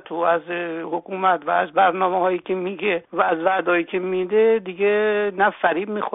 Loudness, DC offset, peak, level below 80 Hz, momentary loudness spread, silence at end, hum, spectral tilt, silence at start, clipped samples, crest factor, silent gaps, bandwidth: -21 LUFS; under 0.1%; -6 dBFS; -70 dBFS; 7 LU; 0.05 s; none; -3 dB/octave; 0.05 s; under 0.1%; 16 dB; none; 4 kHz